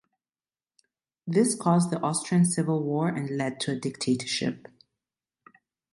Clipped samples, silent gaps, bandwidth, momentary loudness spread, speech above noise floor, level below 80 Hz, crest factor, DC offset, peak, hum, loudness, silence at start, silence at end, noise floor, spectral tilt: under 0.1%; none; 11.5 kHz; 7 LU; over 64 dB; -70 dBFS; 20 dB; under 0.1%; -8 dBFS; none; -26 LUFS; 1.25 s; 1.35 s; under -90 dBFS; -5 dB/octave